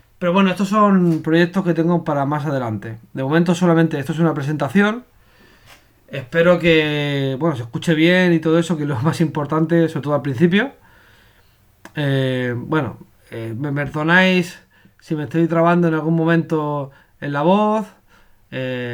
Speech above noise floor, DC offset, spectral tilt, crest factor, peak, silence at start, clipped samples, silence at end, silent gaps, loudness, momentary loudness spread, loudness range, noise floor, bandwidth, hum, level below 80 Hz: 37 dB; under 0.1%; -7 dB/octave; 16 dB; -2 dBFS; 0.2 s; under 0.1%; 0 s; none; -18 LUFS; 13 LU; 3 LU; -54 dBFS; 13.5 kHz; none; -54 dBFS